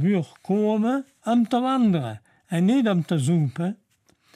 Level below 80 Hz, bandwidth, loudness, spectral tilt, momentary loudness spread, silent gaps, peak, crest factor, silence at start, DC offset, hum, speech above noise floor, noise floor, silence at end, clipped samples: -70 dBFS; 12.5 kHz; -23 LUFS; -7.5 dB/octave; 9 LU; none; -10 dBFS; 12 dB; 0 s; under 0.1%; none; 42 dB; -63 dBFS; 0.6 s; under 0.1%